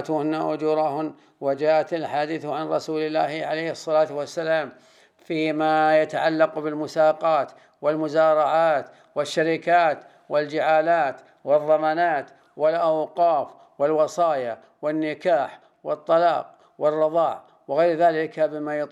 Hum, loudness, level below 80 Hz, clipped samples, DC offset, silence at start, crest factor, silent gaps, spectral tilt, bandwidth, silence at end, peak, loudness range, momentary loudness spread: none; -23 LUFS; -86 dBFS; under 0.1%; under 0.1%; 0 s; 16 dB; none; -5.5 dB/octave; 11 kHz; 0.05 s; -6 dBFS; 3 LU; 11 LU